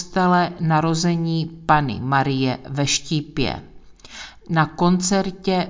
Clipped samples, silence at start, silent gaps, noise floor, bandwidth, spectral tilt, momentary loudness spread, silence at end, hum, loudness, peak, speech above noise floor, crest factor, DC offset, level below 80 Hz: under 0.1%; 0 s; none; -41 dBFS; 7.6 kHz; -5 dB/octave; 7 LU; 0 s; none; -20 LUFS; -2 dBFS; 22 dB; 18 dB; under 0.1%; -46 dBFS